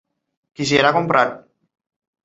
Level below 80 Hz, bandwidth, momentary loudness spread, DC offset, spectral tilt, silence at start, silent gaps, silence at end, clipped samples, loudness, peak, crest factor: -58 dBFS; 8 kHz; 7 LU; under 0.1%; -4.5 dB/octave; 0.6 s; none; 0.85 s; under 0.1%; -17 LUFS; -2 dBFS; 20 dB